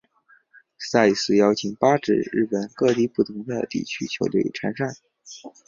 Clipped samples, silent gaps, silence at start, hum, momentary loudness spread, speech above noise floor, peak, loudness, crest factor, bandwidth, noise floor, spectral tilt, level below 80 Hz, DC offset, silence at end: under 0.1%; none; 0.8 s; none; 11 LU; 37 dB; -2 dBFS; -22 LUFS; 20 dB; 7.4 kHz; -59 dBFS; -5 dB/octave; -62 dBFS; under 0.1%; 0.2 s